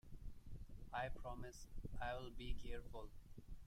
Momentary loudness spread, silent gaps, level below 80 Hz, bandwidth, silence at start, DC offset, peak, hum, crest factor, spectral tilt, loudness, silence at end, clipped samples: 13 LU; none; -52 dBFS; 13.5 kHz; 0.05 s; under 0.1%; -32 dBFS; none; 16 dB; -5 dB/octave; -53 LUFS; 0 s; under 0.1%